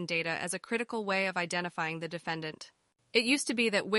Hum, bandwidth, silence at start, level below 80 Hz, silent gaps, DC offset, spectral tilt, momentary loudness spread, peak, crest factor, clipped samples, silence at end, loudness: none; 11.5 kHz; 0 s; -76 dBFS; none; under 0.1%; -3.5 dB/octave; 10 LU; -12 dBFS; 20 dB; under 0.1%; 0 s; -31 LUFS